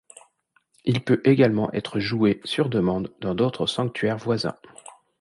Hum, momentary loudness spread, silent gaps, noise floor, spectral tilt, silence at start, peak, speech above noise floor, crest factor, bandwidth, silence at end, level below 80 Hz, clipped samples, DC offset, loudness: none; 9 LU; none; -66 dBFS; -6.5 dB/octave; 0.85 s; -6 dBFS; 44 dB; 18 dB; 11.5 kHz; 0.7 s; -56 dBFS; under 0.1%; under 0.1%; -23 LUFS